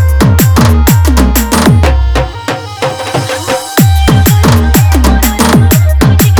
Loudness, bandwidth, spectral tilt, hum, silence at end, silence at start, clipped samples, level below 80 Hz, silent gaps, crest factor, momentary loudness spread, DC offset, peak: -8 LUFS; over 20 kHz; -5.5 dB/octave; none; 0 s; 0 s; 1%; -12 dBFS; none; 6 dB; 8 LU; under 0.1%; 0 dBFS